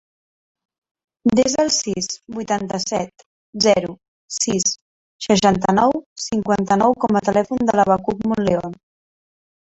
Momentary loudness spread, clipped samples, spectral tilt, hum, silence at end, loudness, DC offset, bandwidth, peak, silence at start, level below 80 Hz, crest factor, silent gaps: 11 LU; under 0.1%; -4 dB/octave; none; 0.9 s; -19 LUFS; under 0.1%; 8.4 kHz; -2 dBFS; 1.25 s; -52 dBFS; 18 dB; 3.26-3.53 s, 4.08-4.28 s, 4.81-5.19 s, 6.06-6.16 s